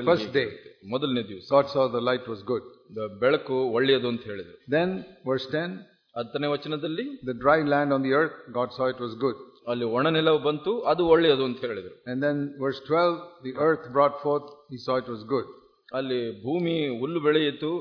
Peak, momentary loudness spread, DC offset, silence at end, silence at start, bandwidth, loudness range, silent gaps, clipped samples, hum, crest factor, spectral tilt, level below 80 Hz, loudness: -6 dBFS; 13 LU; under 0.1%; 0 s; 0 s; 5.4 kHz; 4 LU; none; under 0.1%; none; 20 dB; -7.5 dB/octave; -64 dBFS; -26 LUFS